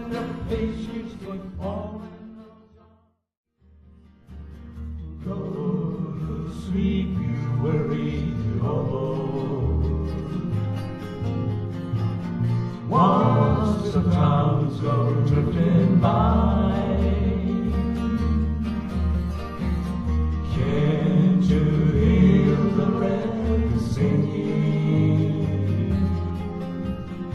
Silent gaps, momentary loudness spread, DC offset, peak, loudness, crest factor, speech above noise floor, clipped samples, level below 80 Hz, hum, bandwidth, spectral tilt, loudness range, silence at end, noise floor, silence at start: 3.37-3.44 s; 13 LU; under 0.1%; -6 dBFS; -23 LUFS; 16 dB; 40 dB; under 0.1%; -34 dBFS; none; 7.4 kHz; -9 dB/octave; 13 LU; 0 s; -61 dBFS; 0 s